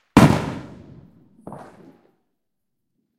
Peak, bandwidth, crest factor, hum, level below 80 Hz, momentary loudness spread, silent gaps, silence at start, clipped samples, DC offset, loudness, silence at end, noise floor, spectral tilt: 0 dBFS; 16 kHz; 24 dB; none; -44 dBFS; 27 LU; none; 0.15 s; under 0.1%; under 0.1%; -17 LUFS; 1.6 s; -81 dBFS; -6.5 dB/octave